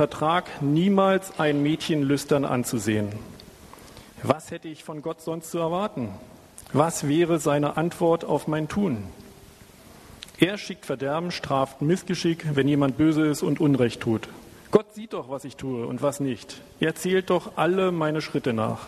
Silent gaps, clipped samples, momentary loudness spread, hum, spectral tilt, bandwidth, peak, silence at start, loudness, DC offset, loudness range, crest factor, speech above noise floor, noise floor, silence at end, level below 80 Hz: none; under 0.1%; 14 LU; none; -6 dB/octave; 13.5 kHz; -2 dBFS; 0 s; -25 LUFS; under 0.1%; 5 LU; 22 dB; 25 dB; -49 dBFS; 0 s; -56 dBFS